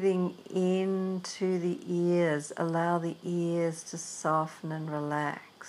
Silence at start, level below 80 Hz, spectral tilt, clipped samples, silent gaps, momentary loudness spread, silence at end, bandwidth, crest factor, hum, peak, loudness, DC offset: 0 s; -86 dBFS; -6 dB/octave; under 0.1%; none; 7 LU; 0 s; 12 kHz; 14 dB; none; -16 dBFS; -31 LUFS; under 0.1%